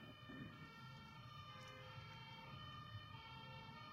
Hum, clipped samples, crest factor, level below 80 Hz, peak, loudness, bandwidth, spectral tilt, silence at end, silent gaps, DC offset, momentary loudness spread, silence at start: none; under 0.1%; 16 dB; -76 dBFS; -42 dBFS; -56 LUFS; 16 kHz; -5.5 dB/octave; 0 s; none; under 0.1%; 3 LU; 0 s